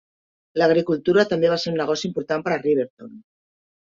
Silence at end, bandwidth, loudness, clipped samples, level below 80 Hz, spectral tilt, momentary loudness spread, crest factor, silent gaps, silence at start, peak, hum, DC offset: 0.65 s; 7.6 kHz; -21 LUFS; under 0.1%; -64 dBFS; -5.5 dB/octave; 7 LU; 18 dB; 2.90-2.97 s; 0.55 s; -4 dBFS; none; under 0.1%